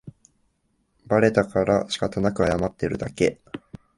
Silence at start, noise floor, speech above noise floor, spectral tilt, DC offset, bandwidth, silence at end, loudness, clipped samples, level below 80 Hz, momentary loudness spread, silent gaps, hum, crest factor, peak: 0.05 s; -69 dBFS; 47 dB; -6 dB/octave; under 0.1%; 11.5 kHz; 0.4 s; -23 LUFS; under 0.1%; -46 dBFS; 12 LU; none; none; 20 dB; -4 dBFS